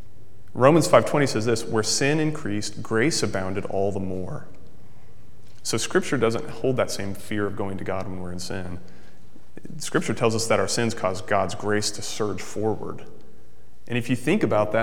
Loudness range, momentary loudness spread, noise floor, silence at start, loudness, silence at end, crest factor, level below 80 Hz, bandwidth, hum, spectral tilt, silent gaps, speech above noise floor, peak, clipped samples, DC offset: 7 LU; 13 LU; -54 dBFS; 0.55 s; -24 LUFS; 0 s; 24 dB; -56 dBFS; 17 kHz; none; -4.5 dB/octave; none; 30 dB; 0 dBFS; under 0.1%; 3%